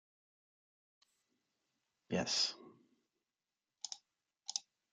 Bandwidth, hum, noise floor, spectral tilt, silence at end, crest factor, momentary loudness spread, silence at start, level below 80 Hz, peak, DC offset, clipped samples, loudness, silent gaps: 11.5 kHz; none; under -90 dBFS; -2.5 dB/octave; 0.3 s; 28 dB; 17 LU; 2.1 s; -84 dBFS; -18 dBFS; under 0.1%; under 0.1%; -39 LUFS; none